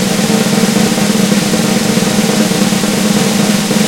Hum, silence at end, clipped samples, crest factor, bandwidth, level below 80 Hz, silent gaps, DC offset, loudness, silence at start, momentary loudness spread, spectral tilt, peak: none; 0 s; under 0.1%; 12 dB; 17 kHz; -42 dBFS; none; 0.3%; -11 LUFS; 0 s; 1 LU; -4 dB/octave; 0 dBFS